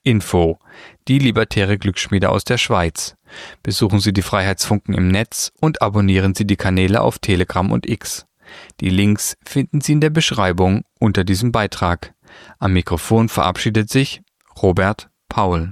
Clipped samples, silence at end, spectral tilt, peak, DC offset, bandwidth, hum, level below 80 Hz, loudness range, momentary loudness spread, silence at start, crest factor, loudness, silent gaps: under 0.1%; 0 s; -5.5 dB/octave; -2 dBFS; under 0.1%; 15 kHz; none; -38 dBFS; 2 LU; 9 LU; 0.05 s; 16 dB; -17 LUFS; none